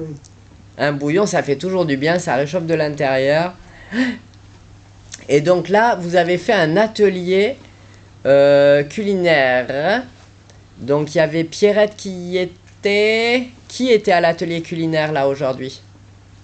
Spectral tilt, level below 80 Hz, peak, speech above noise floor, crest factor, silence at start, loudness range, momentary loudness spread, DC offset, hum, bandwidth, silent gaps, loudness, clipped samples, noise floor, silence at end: -5.5 dB/octave; -52 dBFS; -2 dBFS; 28 dB; 14 dB; 0 s; 4 LU; 12 LU; under 0.1%; none; 9 kHz; none; -17 LUFS; under 0.1%; -44 dBFS; 0.65 s